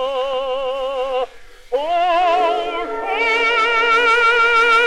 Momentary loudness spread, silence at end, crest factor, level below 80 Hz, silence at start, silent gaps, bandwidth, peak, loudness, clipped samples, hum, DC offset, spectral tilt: 11 LU; 0 s; 14 dB; -46 dBFS; 0 s; none; 12.5 kHz; -4 dBFS; -16 LUFS; under 0.1%; none; under 0.1%; -1.5 dB/octave